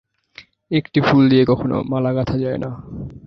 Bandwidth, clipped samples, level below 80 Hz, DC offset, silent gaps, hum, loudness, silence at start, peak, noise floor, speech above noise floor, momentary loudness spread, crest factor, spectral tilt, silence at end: 6.2 kHz; under 0.1%; -44 dBFS; under 0.1%; none; none; -18 LUFS; 0.4 s; -2 dBFS; -46 dBFS; 29 dB; 15 LU; 16 dB; -8.5 dB/octave; 0 s